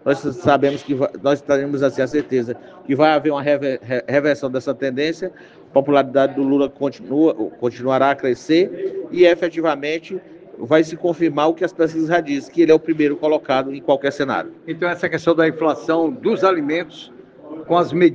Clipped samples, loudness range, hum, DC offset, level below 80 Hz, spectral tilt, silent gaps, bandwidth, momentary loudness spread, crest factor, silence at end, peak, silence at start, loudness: under 0.1%; 2 LU; none; under 0.1%; -64 dBFS; -6.5 dB/octave; none; 7.8 kHz; 9 LU; 18 dB; 0 s; 0 dBFS; 0.05 s; -18 LUFS